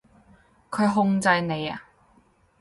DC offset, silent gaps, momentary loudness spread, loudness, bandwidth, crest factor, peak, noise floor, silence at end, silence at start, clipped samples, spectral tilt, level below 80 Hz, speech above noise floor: under 0.1%; none; 13 LU; -24 LUFS; 11.5 kHz; 18 dB; -8 dBFS; -61 dBFS; 0.8 s; 0.7 s; under 0.1%; -5.5 dB/octave; -62 dBFS; 38 dB